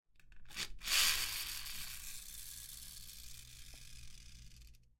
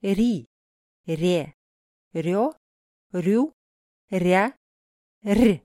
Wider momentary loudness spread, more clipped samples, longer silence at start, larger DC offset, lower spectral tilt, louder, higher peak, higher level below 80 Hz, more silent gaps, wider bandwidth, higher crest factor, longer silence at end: first, 25 LU vs 13 LU; neither; about the same, 0.15 s vs 0.05 s; neither; second, 1 dB/octave vs -7 dB/octave; second, -38 LUFS vs -24 LUFS; second, -18 dBFS vs -6 dBFS; second, -56 dBFS vs -50 dBFS; second, none vs 0.47-1.04 s, 1.54-2.11 s, 2.57-3.10 s, 3.53-4.08 s, 4.57-5.21 s; about the same, 16.5 kHz vs 16 kHz; first, 24 dB vs 18 dB; about the same, 0.1 s vs 0.05 s